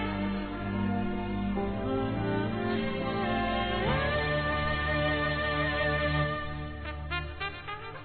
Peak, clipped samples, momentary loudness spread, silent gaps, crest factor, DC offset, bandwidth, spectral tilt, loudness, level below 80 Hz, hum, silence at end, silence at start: -16 dBFS; under 0.1%; 8 LU; none; 14 dB; 0.2%; 4.5 kHz; -9.5 dB/octave; -30 LUFS; -42 dBFS; none; 0 s; 0 s